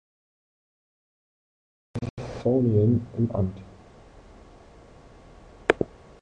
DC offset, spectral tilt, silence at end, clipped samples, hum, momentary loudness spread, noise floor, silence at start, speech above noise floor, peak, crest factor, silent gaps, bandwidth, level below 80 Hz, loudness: under 0.1%; -8.5 dB/octave; 0.35 s; under 0.1%; none; 14 LU; -50 dBFS; 1.95 s; 26 dB; -2 dBFS; 26 dB; 2.10-2.17 s; 9.4 kHz; -50 dBFS; -26 LUFS